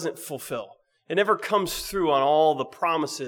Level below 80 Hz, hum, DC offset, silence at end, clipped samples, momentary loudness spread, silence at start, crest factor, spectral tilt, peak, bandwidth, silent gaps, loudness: -56 dBFS; none; under 0.1%; 0 s; under 0.1%; 14 LU; 0 s; 16 dB; -4 dB/octave; -8 dBFS; over 20 kHz; none; -24 LUFS